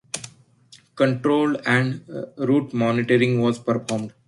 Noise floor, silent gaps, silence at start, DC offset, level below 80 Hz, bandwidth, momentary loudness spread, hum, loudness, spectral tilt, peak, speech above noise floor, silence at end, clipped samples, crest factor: -53 dBFS; none; 0.15 s; under 0.1%; -62 dBFS; 11.5 kHz; 14 LU; none; -21 LUFS; -6 dB/octave; -6 dBFS; 32 dB; 0.2 s; under 0.1%; 16 dB